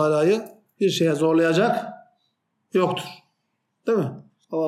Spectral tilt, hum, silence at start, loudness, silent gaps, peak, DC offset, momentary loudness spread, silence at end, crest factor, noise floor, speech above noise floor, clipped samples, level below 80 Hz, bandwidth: -6 dB/octave; none; 0 s; -22 LUFS; none; -8 dBFS; under 0.1%; 13 LU; 0 s; 14 dB; -75 dBFS; 54 dB; under 0.1%; -76 dBFS; 14 kHz